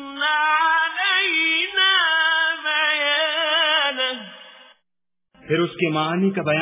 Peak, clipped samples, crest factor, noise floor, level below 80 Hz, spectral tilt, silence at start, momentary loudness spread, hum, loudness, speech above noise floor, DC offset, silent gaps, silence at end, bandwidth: -6 dBFS; under 0.1%; 16 dB; -84 dBFS; -68 dBFS; -7.5 dB/octave; 0 s; 7 LU; none; -18 LUFS; 63 dB; under 0.1%; none; 0 s; 3.9 kHz